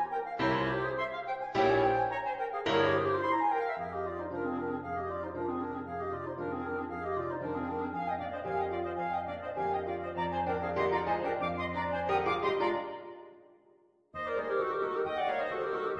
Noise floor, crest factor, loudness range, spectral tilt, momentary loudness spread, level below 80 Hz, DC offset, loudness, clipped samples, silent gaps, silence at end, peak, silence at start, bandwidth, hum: -65 dBFS; 18 dB; 6 LU; -7 dB/octave; 8 LU; -60 dBFS; under 0.1%; -33 LUFS; under 0.1%; none; 0 s; -16 dBFS; 0 s; 7.8 kHz; none